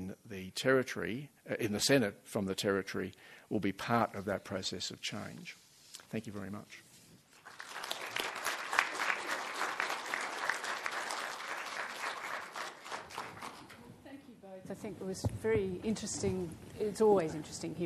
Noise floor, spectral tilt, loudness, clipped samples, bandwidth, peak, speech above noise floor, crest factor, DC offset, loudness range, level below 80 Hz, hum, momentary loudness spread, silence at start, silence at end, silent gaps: -61 dBFS; -4 dB/octave; -36 LUFS; under 0.1%; 13 kHz; -8 dBFS; 26 dB; 30 dB; under 0.1%; 9 LU; -66 dBFS; none; 19 LU; 0 s; 0 s; none